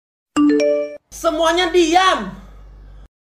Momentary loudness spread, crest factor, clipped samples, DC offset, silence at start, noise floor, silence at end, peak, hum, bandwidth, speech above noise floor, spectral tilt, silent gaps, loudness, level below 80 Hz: 11 LU; 16 dB; under 0.1%; under 0.1%; 0.35 s; -39 dBFS; 0.35 s; -2 dBFS; none; 15.5 kHz; 24 dB; -3 dB/octave; none; -16 LUFS; -44 dBFS